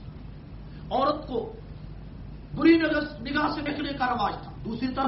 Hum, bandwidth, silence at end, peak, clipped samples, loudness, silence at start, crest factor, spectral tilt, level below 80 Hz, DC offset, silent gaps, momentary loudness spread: none; 5.8 kHz; 0 s; -8 dBFS; under 0.1%; -26 LUFS; 0 s; 20 dB; -4 dB/octave; -44 dBFS; under 0.1%; none; 22 LU